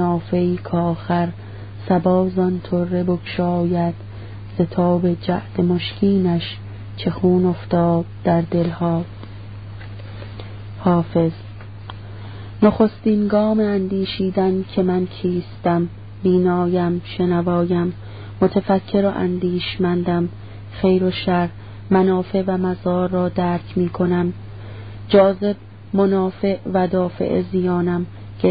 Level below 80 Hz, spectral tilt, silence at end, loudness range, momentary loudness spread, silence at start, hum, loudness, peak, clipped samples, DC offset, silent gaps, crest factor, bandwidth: -44 dBFS; -12.5 dB/octave; 0 s; 2 LU; 17 LU; 0 s; none; -19 LUFS; 0 dBFS; under 0.1%; 0.5%; none; 18 dB; 5 kHz